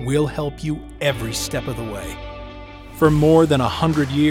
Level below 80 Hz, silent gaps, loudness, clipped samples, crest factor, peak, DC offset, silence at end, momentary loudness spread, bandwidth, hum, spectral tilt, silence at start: -38 dBFS; none; -19 LUFS; under 0.1%; 16 dB; -2 dBFS; under 0.1%; 0 s; 21 LU; 16.5 kHz; none; -6 dB/octave; 0 s